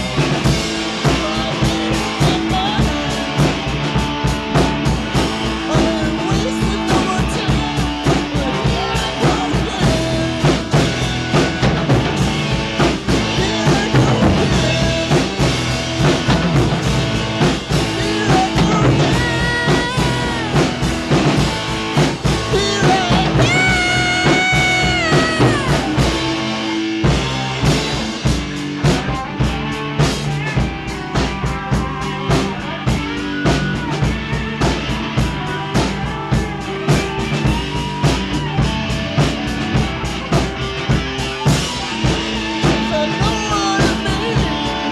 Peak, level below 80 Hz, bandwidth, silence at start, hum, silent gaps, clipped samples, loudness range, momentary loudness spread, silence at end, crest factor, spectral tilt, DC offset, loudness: -2 dBFS; -28 dBFS; 13.5 kHz; 0 s; none; none; under 0.1%; 5 LU; 6 LU; 0 s; 16 dB; -5 dB/octave; under 0.1%; -17 LUFS